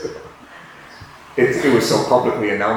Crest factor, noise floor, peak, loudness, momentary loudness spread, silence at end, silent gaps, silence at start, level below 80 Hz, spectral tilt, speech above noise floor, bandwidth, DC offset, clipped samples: 16 dB; -41 dBFS; -2 dBFS; -17 LUFS; 24 LU; 0 s; none; 0 s; -52 dBFS; -5 dB/octave; 25 dB; 19 kHz; under 0.1%; under 0.1%